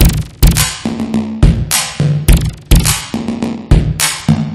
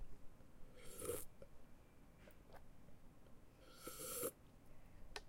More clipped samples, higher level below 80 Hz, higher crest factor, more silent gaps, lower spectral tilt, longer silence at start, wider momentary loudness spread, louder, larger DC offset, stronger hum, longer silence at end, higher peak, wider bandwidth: first, 0.3% vs under 0.1%; first, -16 dBFS vs -64 dBFS; second, 12 dB vs 22 dB; neither; first, -4.5 dB/octave vs -3 dB/octave; about the same, 0 s vs 0 s; second, 7 LU vs 21 LU; first, -13 LUFS vs -50 LUFS; neither; neither; about the same, 0 s vs 0 s; first, 0 dBFS vs -30 dBFS; about the same, 16.5 kHz vs 16.5 kHz